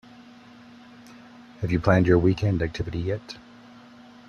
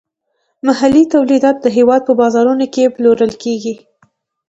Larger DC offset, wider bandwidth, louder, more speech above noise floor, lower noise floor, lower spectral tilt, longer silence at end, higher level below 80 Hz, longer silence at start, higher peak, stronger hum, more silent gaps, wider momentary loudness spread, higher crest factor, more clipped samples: neither; second, 7 kHz vs 8 kHz; second, -24 LUFS vs -12 LUFS; second, 26 dB vs 56 dB; second, -48 dBFS vs -67 dBFS; first, -8 dB/octave vs -5.5 dB/octave; first, 0.9 s vs 0.75 s; about the same, -46 dBFS vs -50 dBFS; second, 0.2 s vs 0.65 s; second, -6 dBFS vs 0 dBFS; neither; neither; first, 15 LU vs 9 LU; first, 20 dB vs 12 dB; neither